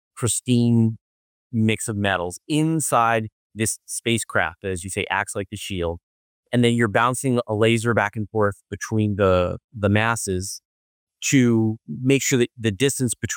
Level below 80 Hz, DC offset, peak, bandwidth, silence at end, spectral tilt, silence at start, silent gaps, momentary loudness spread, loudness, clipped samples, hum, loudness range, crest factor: -56 dBFS; under 0.1%; -6 dBFS; 17 kHz; 0 s; -5 dB/octave; 0.15 s; 1.01-1.50 s, 3.32-3.50 s, 6.03-6.43 s, 9.64-9.69 s, 10.65-11.07 s; 9 LU; -22 LUFS; under 0.1%; none; 2 LU; 16 dB